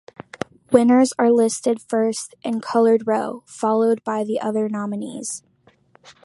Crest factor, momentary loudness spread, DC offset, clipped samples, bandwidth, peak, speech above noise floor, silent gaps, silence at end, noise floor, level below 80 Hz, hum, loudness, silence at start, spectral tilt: 20 dB; 14 LU; under 0.1%; under 0.1%; 11.5 kHz; 0 dBFS; 37 dB; none; 0.15 s; -56 dBFS; -66 dBFS; none; -20 LUFS; 0.7 s; -5 dB/octave